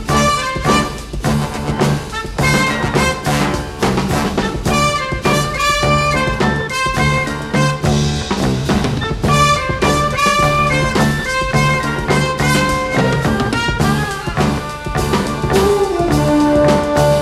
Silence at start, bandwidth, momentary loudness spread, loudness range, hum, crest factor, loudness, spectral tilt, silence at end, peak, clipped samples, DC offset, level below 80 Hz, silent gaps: 0 s; 15 kHz; 5 LU; 2 LU; none; 14 dB; -15 LUFS; -5 dB/octave; 0 s; 0 dBFS; under 0.1%; under 0.1%; -28 dBFS; none